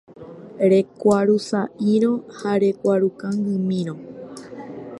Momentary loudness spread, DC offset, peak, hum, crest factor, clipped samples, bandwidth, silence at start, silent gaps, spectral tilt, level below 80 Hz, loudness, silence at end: 19 LU; under 0.1%; -6 dBFS; none; 16 dB; under 0.1%; 11.5 kHz; 0.1 s; none; -7.5 dB/octave; -64 dBFS; -20 LUFS; 0 s